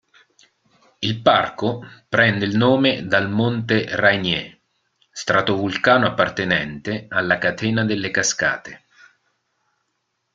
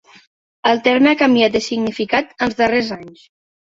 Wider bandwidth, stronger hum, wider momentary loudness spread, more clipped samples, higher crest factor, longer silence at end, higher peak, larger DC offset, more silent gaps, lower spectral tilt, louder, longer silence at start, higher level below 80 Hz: first, 9.4 kHz vs 7.8 kHz; neither; about the same, 10 LU vs 9 LU; neither; about the same, 20 dB vs 16 dB; first, 1.6 s vs 0.7 s; about the same, -2 dBFS vs -2 dBFS; neither; neither; about the same, -4.5 dB/octave vs -4.5 dB/octave; second, -19 LUFS vs -16 LUFS; first, 1 s vs 0.65 s; about the same, -56 dBFS vs -54 dBFS